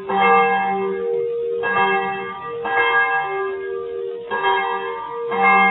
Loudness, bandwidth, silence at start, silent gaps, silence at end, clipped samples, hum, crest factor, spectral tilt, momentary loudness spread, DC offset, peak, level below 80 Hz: -19 LUFS; 4.1 kHz; 0 s; none; 0 s; under 0.1%; none; 16 dB; -9 dB/octave; 12 LU; under 0.1%; -4 dBFS; -62 dBFS